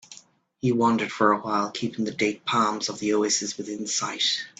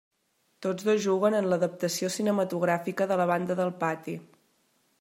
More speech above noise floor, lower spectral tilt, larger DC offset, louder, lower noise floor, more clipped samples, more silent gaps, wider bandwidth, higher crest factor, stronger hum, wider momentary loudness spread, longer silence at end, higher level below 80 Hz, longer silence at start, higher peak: second, 29 dB vs 45 dB; second, -3 dB/octave vs -5 dB/octave; neither; first, -25 LUFS vs -28 LUFS; second, -54 dBFS vs -72 dBFS; neither; neither; second, 9.4 kHz vs 16 kHz; about the same, 22 dB vs 18 dB; neither; about the same, 7 LU vs 9 LU; second, 0.1 s vs 0.8 s; first, -68 dBFS vs -78 dBFS; second, 0.1 s vs 0.6 s; first, -4 dBFS vs -12 dBFS